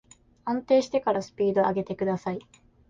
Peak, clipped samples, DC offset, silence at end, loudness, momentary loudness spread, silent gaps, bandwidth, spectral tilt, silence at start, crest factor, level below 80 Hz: -10 dBFS; under 0.1%; under 0.1%; 0.5 s; -26 LUFS; 11 LU; none; 7.6 kHz; -6.5 dB/octave; 0.45 s; 16 dB; -62 dBFS